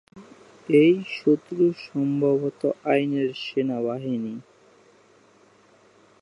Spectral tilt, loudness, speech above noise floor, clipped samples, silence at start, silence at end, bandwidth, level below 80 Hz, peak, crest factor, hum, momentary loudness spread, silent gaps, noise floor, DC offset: -8 dB/octave; -23 LUFS; 34 dB; under 0.1%; 0.15 s; 1.8 s; 10.5 kHz; -76 dBFS; -8 dBFS; 18 dB; none; 11 LU; none; -57 dBFS; under 0.1%